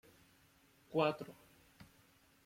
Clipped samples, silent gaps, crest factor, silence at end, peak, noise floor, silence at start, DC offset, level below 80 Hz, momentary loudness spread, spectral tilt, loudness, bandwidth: under 0.1%; none; 24 dB; 0.65 s; -20 dBFS; -69 dBFS; 0.9 s; under 0.1%; -78 dBFS; 27 LU; -6.5 dB/octave; -38 LUFS; 16.5 kHz